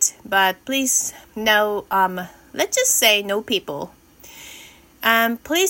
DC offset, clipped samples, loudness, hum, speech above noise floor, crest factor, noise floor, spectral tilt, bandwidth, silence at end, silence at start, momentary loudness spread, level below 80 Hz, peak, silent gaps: under 0.1%; under 0.1%; -18 LUFS; none; 25 dB; 20 dB; -45 dBFS; -1 dB/octave; 17 kHz; 0 s; 0 s; 18 LU; -58 dBFS; -2 dBFS; none